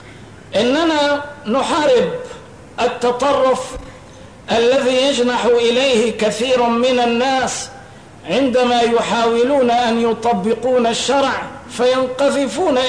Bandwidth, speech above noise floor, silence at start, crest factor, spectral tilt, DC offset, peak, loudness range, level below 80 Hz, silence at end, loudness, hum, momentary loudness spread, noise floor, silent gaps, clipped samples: 10.5 kHz; 23 dB; 0 s; 10 dB; -3.5 dB/octave; 0.2%; -6 dBFS; 3 LU; -48 dBFS; 0 s; -16 LUFS; none; 9 LU; -38 dBFS; none; under 0.1%